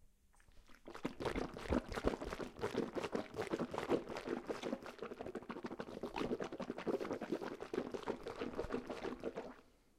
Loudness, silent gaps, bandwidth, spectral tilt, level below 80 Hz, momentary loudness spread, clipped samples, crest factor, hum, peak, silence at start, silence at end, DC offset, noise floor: -44 LUFS; none; 15.5 kHz; -6 dB/octave; -58 dBFS; 8 LU; under 0.1%; 24 dB; none; -20 dBFS; 0 s; 0.3 s; under 0.1%; -67 dBFS